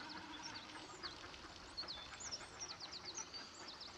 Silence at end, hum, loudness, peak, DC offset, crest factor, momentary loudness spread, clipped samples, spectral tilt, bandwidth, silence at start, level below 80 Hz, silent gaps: 0 s; none; -49 LUFS; -34 dBFS; under 0.1%; 16 dB; 5 LU; under 0.1%; -1 dB/octave; 13 kHz; 0 s; -70 dBFS; none